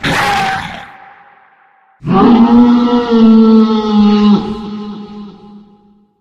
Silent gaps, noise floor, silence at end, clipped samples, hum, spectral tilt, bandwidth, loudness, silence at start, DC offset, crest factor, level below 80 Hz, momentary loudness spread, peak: none; -49 dBFS; 0.9 s; under 0.1%; none; -6.5 dB/octave; 11 kHz; -9 LUFS; 0 s; under 0.1%; 10 dB; -40 dBFS; 20 LU; 0 dBFS